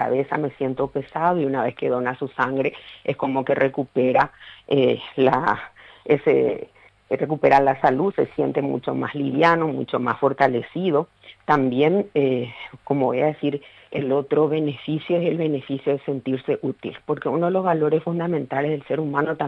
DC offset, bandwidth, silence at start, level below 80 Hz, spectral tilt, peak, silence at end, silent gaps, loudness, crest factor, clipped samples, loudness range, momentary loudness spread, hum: under 0.1%; 6.8 kHz; 0 s; -60 dBFS; -8.5 dB/octave; -4 dBFS; 0 s; none; -22 LUFS; 18 dB; under 0.1%; 3 LU; 8 LU; none